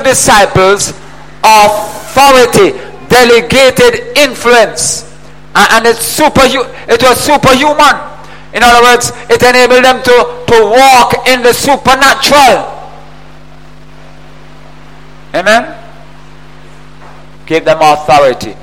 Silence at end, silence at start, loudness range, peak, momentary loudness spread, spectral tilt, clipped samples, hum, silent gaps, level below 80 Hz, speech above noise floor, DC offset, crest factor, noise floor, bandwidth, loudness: 0.1 s; 0 s; 11 LU; 0 dBFS; 9 LU; -2.5 dB/octave; 1%; none; none; -34 dBFS; 28 dB; 4%; 8 dB; -34 dBFS; 17 kHz; -6 LUFS